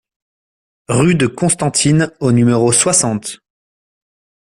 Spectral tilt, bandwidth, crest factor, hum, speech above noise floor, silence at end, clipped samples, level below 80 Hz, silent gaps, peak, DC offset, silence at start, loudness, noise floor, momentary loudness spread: -4.5 dB/octave; 14 kHz; 16 dB; none; over 77 dB; 1.2 s; under 0.1%; -48 dBFS; none; 0 dBFS; under 0.1%; 0.9 s; -13 LUFS; under -90 dBFS; 8 LU